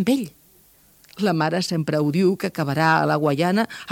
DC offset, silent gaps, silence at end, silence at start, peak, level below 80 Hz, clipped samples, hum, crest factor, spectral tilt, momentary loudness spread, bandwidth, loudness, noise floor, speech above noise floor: under 0.1%; none; 0 s; 0 s; -4 dBFS; -64 dBFS; under 0.1%; none; 18 dB; -6 dB/octave; 6 LU; 17 kHz; -21 LUFS; -55 dBFS; 34 dB